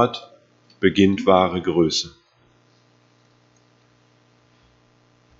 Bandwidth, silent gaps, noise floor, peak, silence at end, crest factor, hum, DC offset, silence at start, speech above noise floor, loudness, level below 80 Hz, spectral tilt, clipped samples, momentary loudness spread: 7.8 kHz; none; -59 dBFS; 0 dBFS; 3.3 s; 22 dB; 60 Hz at -55 dBFS; under 0.1%; 0 s; 40 dB; -19 LUFS; -56 dBFS; -5 dB/octave; under 0.1%; 11 LU